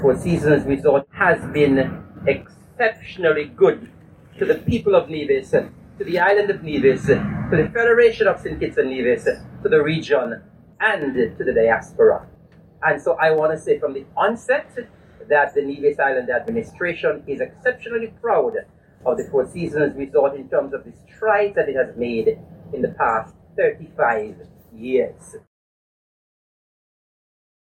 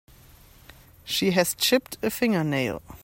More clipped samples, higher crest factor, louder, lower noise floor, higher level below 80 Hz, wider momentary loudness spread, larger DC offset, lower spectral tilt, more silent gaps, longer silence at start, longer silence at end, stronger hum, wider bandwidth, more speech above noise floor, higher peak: neither; about the same, 18 dB vs 20 dB; first, -20 LUFS vs -24 LUFS; second, -48 dBFS vs -52 dBFS; first, -50 dBFS vs -56 dBFS; about the same, 9 LU vs 8 LU; neither; first, -6.5 dB/octave vs -4 dB/octave; neither; second, 0 s vs 1.05 s; first, 2.25 s vs 0.05 s; neither; second, 11 kHz vs 16.5 kHz; about the same, 29 dB vs 27 dB; first, -2 dBFS vs -6 dBFS